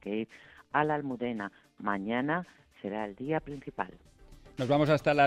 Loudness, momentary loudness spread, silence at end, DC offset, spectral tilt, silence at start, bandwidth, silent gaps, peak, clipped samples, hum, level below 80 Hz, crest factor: -32 LUFS; 16 LU; 0 s; under 0.1%; -7 dB/octave; 0.05 s; 12.5 kHz; none; -12 dBFS; under 0.1%; none; -60 dBFS; 20 dB